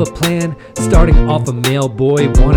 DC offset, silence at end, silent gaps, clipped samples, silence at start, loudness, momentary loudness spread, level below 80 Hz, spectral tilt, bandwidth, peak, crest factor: under 0.1%; 0 s; none; 0.8%; 0 s; -14 LUFS; 8 LU; -14 dBFS; -6 dB/octave; 18.5 kHz; 0 dBFS; 10 dB